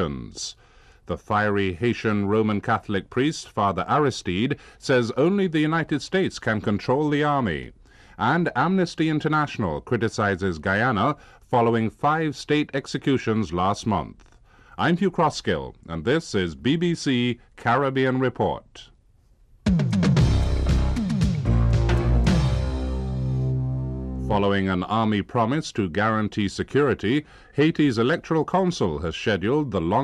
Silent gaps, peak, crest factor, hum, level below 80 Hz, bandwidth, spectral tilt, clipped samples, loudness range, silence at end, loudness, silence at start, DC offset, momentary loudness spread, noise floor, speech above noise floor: none; -8 dBFS; 14 dB; none; -34 dBFS; 11 kHz; -6.5 dB/octave; under 0.1%; 2 LU; 0 s; -23 LUFS; 0 s; under 0.1%; 7 LU; -57 dBFS; 34 dB